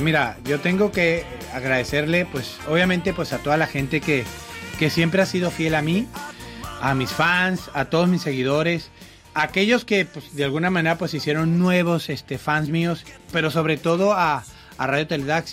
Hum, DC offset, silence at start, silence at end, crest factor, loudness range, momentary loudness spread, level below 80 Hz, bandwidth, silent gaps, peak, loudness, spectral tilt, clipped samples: none; under 0.1%; 0 s; 0 s; 16 dB; 1 LU; 10 LU; -48 dBFS; 16 kHz; none; -6 dBFS; -22 LUFS; -5.5 dB/octave; under 0.1%